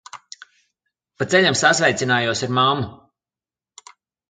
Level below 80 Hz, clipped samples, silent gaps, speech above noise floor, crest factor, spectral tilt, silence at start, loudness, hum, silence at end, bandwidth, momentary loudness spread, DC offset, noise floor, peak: -56 dBFS; under 0.1%; none; over 72 dB; 20 dB; -3.5 dB/octave; 0.15 s; -18 LUFS; none; 1.35 s; 9.6 kHz; 16 LU; under 0.1%; under -90 dBFS; -2 dBFS